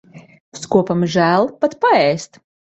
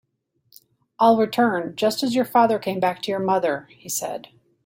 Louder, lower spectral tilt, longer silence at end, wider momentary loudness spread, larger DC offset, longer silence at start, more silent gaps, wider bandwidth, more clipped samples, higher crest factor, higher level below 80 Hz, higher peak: first, -16 LUFS vs -21 LUFS; first, -5.5 dB/octave vs -4 dB/octave; about the same, 0.55 s vs 0.45 s; about the same, 12 LU vs 10 LU; neither; second, 0.15 s vs 1 s; first, 0.40-0.52 s vs none; second, 8.2 kHz vs 16.5 kHz; neither; about the same, 16 dB vs 18 dB; first, -58 dBFS vs -68 dBFS; about the same, -2 dBFS vs -4 dBFS